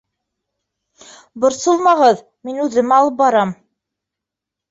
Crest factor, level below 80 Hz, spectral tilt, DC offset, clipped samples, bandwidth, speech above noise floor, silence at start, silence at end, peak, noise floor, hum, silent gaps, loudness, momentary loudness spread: 16 dB; -62 dBFS; -4.5 dB/octave; under 0.1%; under 0.1%; 8 kHz; 69 dB; 1.35 s; 1.15 s; -2 dBFS; -84 dBFS; none; none; -15 LUFS; 11 LU